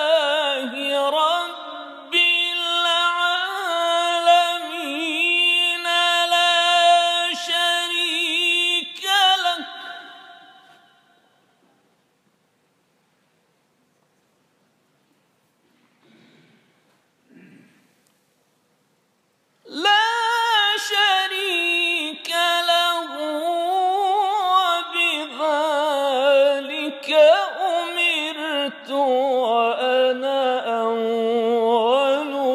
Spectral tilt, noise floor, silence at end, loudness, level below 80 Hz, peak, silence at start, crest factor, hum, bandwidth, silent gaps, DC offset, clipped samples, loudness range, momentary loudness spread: -0.5 dB/octave; -66 dBFS; 0 s; -19 LUFS; -88 dBFS; -4 dBFS; 0 s; 18 dB; none; 15.5 kHz; none; under 0.1%; under 0.1%; 4 LU; 8 LU